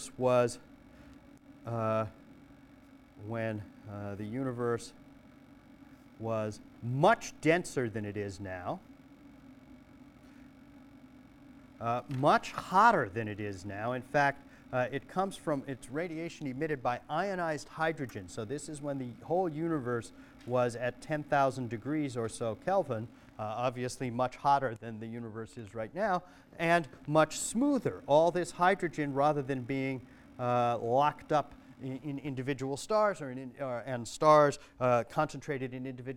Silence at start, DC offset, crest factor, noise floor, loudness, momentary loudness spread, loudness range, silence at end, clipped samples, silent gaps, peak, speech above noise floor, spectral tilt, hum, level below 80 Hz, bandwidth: 0 s; under 0.1%; 22 dB; -57 dBFS; -32 LUFS; 14 LU; 9 LU; 0 s; under 0.1%; none; -10 dBFS; 25 dB; -5.5 dB/octave; none; -64 dBFS; 16 kHz